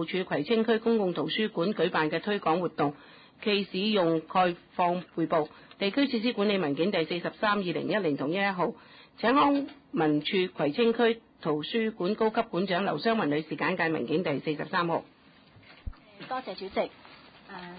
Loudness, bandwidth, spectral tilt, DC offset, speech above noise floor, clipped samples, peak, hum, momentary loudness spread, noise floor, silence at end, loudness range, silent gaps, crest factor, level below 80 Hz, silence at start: -28 LUFS; 5 kHz; -10 dB/octave; under 0.1%; 29 dB; under 0.1%; -12 dBFS; none; 8 LU; -57 dBFS; 0 s; 4 LU; none; 16 dB; -58 dBFS; 0 s